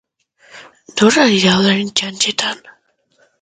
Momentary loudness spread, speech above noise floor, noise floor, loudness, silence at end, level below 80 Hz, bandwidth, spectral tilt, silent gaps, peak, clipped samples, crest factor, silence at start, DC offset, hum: 11 LU; 44 dB; -58 dBFS; -14 LUFS; 0.85 s; -56 dBFS; 9.6 kHz; -3.5 dB/octave; none; 0 dBFS; under 0.1%; 16 dB; 0.55 s; under 0.1%; none